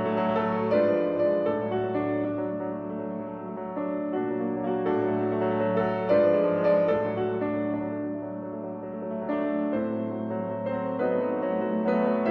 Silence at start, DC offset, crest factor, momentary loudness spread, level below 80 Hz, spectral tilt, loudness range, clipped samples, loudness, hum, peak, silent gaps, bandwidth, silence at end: 0 s; under 0.1%; 16 dB; 11 LU; -64 dBFS; -10 dB/octave; 5 LU; under 0.1%; -27 LUFS; none; -10 dBFS; none; 5.6 kHz; 0 s